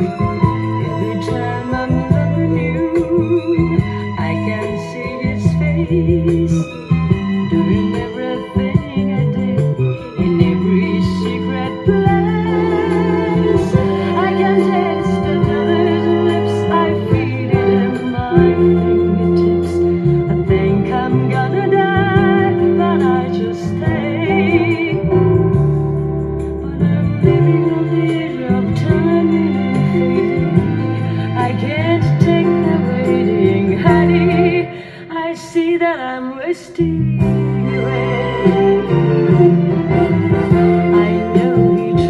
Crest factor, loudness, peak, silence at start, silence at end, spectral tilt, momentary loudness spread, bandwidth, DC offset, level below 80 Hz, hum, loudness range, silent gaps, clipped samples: 14 dB; -15 LUFS; 0 dBFS; 0 s; 0 s; -8.5 dB/octave; 7 LU; 10.5 kHz; under 0.1%; -36 dBFS; none; 3 LU; none; under 0.1%